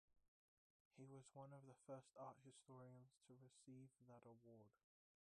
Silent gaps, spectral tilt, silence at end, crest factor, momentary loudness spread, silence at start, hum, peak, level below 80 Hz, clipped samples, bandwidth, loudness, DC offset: 0.28-0.91 s; -6.5 dB/octave; 0.6 s; 20 dB; 7 LU; 0.1 s; none; -46 dBFS; under -90 dBFS; under 0.1%; 10.5 kHz; -64 LUFS; under 0.1%